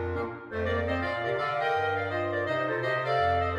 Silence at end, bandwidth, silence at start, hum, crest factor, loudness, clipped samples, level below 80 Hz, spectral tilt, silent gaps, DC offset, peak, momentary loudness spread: 0 s; 10 kHz; 0 s; none; 14 dB; -29 LUFS; under 0.1%; -50 dBFS; -7 dB/octave; none; under 0.1%; -16 dBFS; 6 LU